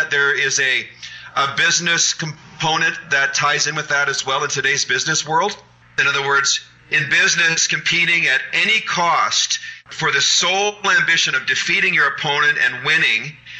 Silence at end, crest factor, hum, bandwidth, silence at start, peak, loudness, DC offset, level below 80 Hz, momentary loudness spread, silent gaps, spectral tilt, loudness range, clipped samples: 0 s; 14 dB; none; 8.8 kHz; 0 s; -4 dBFS; -16 LUFS; under 0.1%; -62 dBFS; 7 LU; none; -1 dB/octave; 2 LU; under 0.1%